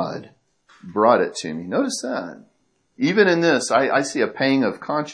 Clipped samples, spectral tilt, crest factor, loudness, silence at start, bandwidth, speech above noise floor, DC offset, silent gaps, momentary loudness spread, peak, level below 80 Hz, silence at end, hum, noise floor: under 0.1%; -4.5 dB/octave; 18 dB; -20 LUFS; 0 s; 11 kHz; 36 dB; under 0.1%; none; 13 LU; -2 dBFS; -70 dBFS; 0 s; none; -56 dBFS